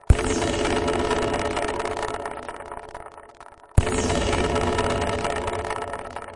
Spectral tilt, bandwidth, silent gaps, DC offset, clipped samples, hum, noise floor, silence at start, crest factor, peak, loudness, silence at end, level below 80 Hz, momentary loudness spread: -5 dB/octave; 11.5 kHz; none; under 0.1%; under 0.1%; none; -46 dBFS; 0.1 s; 24 dB; 0 dBFS; -25 LUFS; 0 s; -32 dBFS; 14 LU